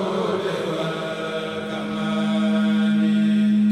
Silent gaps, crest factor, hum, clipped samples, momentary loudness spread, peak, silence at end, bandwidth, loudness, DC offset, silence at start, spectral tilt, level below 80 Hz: none; 10 dB; none; under 0.1%; 9 LU; -12 dBFS; 0 s; 10 kHz; -22 LUFS; under 0.1%; 0 s; -7 dB/octave; -64 dBFS